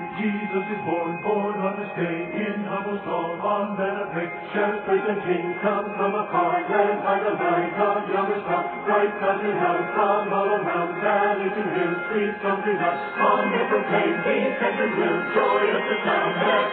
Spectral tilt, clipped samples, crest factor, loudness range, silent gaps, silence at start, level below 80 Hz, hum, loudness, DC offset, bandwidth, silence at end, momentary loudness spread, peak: -3.5 dB/octave; under 0.1%; 18 dB; 4 LU; none; 0 s; -66 dBFS; none; -23 LUFS; under 0.1%; 4.4 kHz; 0 s; 6 LU; -6 dBFS